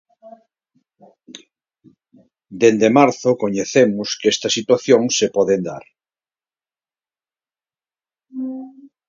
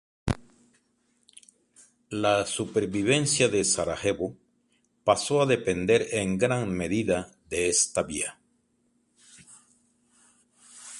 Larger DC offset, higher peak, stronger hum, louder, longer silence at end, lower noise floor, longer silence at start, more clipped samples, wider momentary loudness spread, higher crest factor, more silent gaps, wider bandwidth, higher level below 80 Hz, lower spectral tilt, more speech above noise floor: neither; first, 0 dBFS vs -8 dBFS; neither; first, -16 LUFS vs -26 LUFS; first, 0.2 s vs 0 s; first, under -90 dBFS vs -70 dBFS; about the same, 0.25 s vs 0.25 s; neither; first, 16 LU vs 10 LU; about the same, 20 dB vs 22 dB; neither; second, 7.6 kHz vs 11.5 kHz; second, -64 dBFS vs -52 dBFS; about the same, -4 dB/octave vs -3.5 dB/octave; first, over 74 dB vs 45 dB